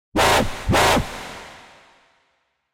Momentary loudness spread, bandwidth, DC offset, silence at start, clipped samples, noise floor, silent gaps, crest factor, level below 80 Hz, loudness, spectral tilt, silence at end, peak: 21 LU; 16 kHz; under 0.1%; 0.15 s; under 0.1%; -69 dBFS; none; 18 dB; -36 dBFS; -18 LUFS; -3.5 dB/octave; 1.15 s; -4 dBFS